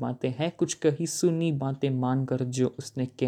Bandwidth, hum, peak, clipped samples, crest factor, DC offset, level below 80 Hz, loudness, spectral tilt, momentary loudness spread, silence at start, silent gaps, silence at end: 15 kHz; none; -12 dBFS; under 0.1%; 16 dB; under 0.1%; -68 dBFS; -28 LUFS; -6 dB/octave; 4 LU; 0 s; none; 0 s